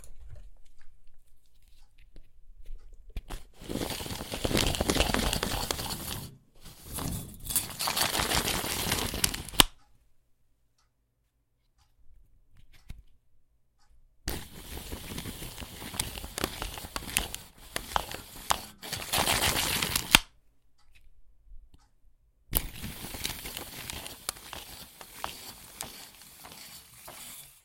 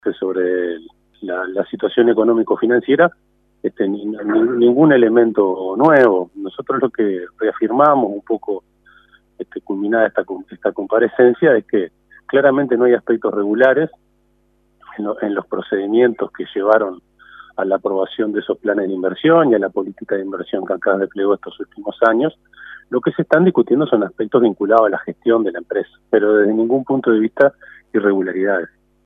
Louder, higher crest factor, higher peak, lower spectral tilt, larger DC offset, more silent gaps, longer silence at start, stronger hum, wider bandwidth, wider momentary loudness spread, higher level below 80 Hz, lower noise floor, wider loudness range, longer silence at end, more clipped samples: second, -30 LUFS vs -16 LUFS; first, 34 dB vs 16 dB; about the same, 0 dBFS vs 0 dBFS; second, -2 dB/octave vs -9 dB/octave; neither; neither; about the same, 0 s vs 0.05 s; neither; first, 17 kHz vs 3.9 kHz; first, 20 LU vs 12 LU; first, -44 dBFS vs -64 dBFS; first, -74 dBFS vs -59 dBFS; first, 15 LU vs 5 LU; second, 0.1 s vs 0.4 s; neither